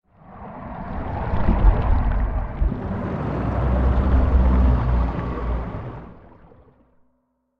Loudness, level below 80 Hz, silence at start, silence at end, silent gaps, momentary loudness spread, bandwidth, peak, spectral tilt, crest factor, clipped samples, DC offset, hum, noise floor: -23 LUFS; -22 dBFS; 0.3 s; 1.4 s; none; 16 LU; 4.4 kHz; -4 dBFS; -10.5 dB/octave; 18 dB; under 0.1%; under 0.1%; none; -69 dBFS